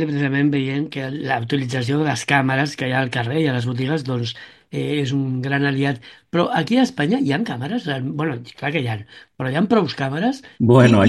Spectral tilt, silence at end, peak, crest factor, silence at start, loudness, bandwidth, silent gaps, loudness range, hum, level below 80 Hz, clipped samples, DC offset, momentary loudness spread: -6.5 dB/octave; 0 s; 0 dBFS; 20 dB; 0 s; -20 LUFS; 12 kHz; none; 2 LU; none; -58 dBFS; under 0.1%; under 0.1%; 8 LU